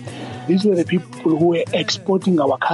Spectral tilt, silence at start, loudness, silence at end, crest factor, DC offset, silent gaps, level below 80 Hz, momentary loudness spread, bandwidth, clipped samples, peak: -6 dB/octave; 0 s; -18 LUFS; 0 s; 12 dB; under 0.1%; none; -64 dBFS; 5 LU; 11.5 kHz; under 0.1%; -8 dBFS